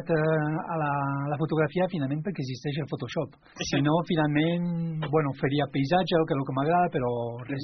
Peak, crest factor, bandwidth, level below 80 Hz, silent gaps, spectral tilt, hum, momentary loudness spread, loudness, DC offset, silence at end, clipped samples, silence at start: -10 dBFS; 18 dB; 6.4 kHz; -58 dBFS; none; -6 dB/octave; none; 8 LU; -27 LUFS; under 0.1%; 0 s; under 0.1%; 0 s